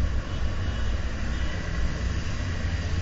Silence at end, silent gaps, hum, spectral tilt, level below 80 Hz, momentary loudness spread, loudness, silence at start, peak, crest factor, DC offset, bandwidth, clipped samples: 0 s; none; none; -5.5 dB/octave; -28 dBFS; 1 LU; -30 LUFS; 0 s; -14 dBFS; 12 dB; under 0.1%; 7.8 kHz; under 0.1%